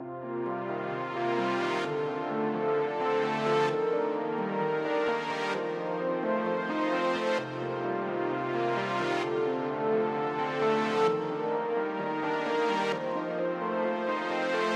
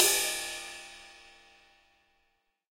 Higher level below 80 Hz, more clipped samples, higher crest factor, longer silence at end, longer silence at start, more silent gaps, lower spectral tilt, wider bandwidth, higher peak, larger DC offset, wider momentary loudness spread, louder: second, -78 dBFS vs -66 dBFS; neither; second, 14 dB vs 28 dB; second, 0 s vs 1.65 s; about the same, 0 s vs 0 s; neither; first, -6 dB/octave vs 1.5 dB/octave; second, 10 kHz vs 16 kHz; second, -16 dBFS vs -6 dBFS; neither; second, 5 LU vs 25 LU; about the same, -30 LUFS vs -30 LUFS